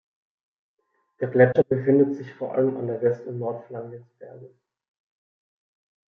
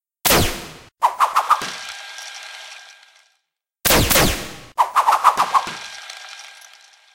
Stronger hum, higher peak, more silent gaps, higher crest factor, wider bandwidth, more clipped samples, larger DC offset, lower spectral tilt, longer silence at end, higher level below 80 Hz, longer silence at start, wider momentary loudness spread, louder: neither; second, -4 dBFS vs 0 dBFS; neither; about the same, 22 dB vs 20 dB; second, 6 kHz vs 17 kHz; neither; neither; first, -10.5 dB/octave vs -2.5 dB/octave; first, 1.65 s vs 0.6 s; second, -70 dBFS vs -36 dBFS; first, 1.2 s vs 0.25 s; about the same, 19 LU vs 21 LU; second, -23 LUFS vs -17 LUFS